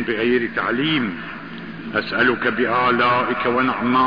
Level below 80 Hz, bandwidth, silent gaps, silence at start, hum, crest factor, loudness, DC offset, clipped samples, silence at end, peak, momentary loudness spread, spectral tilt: -54 dBFS; 5.2 kHz; none; 0 s; none; 14 dB; -19 LUFS; 0.5%; under 0.1%; 0 s; -6 dBFS; 14 LU; -7.5 dB/octave